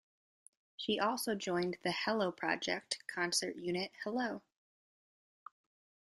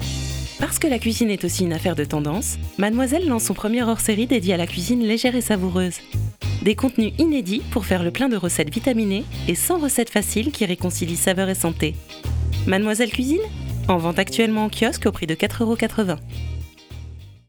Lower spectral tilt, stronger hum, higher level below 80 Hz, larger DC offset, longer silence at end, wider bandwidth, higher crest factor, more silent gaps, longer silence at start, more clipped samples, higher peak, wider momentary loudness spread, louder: second, -3 dB/octave vs -4.5 dB/octave; neither; second, -78 dBFS vs -36 dBFS; neither; first, 1.7 s vs 0.1 s; second, 13.5 kHz vs over 20 kHz; first, 22 dB vs 16 dB; neither; first, 0.8 s vs 0 s; neither; second, -18 dBFS vs -4 dBFS; about the same, 6 LU vs 7 LU; second, -37 LUFS vs -21 LUFS